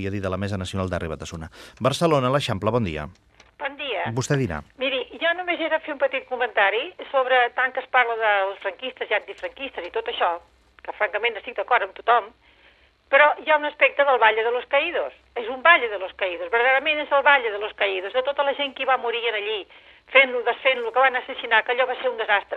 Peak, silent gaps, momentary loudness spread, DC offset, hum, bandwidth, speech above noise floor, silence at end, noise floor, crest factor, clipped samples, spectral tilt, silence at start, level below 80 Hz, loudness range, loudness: 0 dBFS; none; 13 LU; under 0.1%; none; 12.5 kHz; 34 dB; 0 s; -57 dBFS; 22 dB; under 0.1%; -4.5 dB/octave; 0 s; -56 dBFS; 5 LU; -22 LUFS